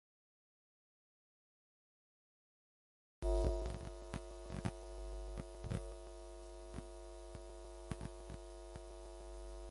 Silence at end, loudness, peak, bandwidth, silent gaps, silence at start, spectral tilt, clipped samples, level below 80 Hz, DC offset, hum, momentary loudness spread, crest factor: 0 s; -48 LUFS; -22 dBFS; 11.5 kHz; none; 3.2 s; -6.5 dB/octave; under 0.1%; -50 dBFS; under 0.1%; none; 13 LU; 24 dB